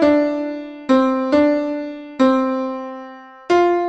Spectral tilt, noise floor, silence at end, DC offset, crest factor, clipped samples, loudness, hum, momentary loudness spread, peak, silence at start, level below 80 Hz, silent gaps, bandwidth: -5.5 dB/octave; -37 dBFS; 0 s; under 0.1%; 14 dB; under 0.1%; -18 LUFS; none; 15 LU; -4 dBFS; 0 s; -54 dBFS; none; 8.2 kHz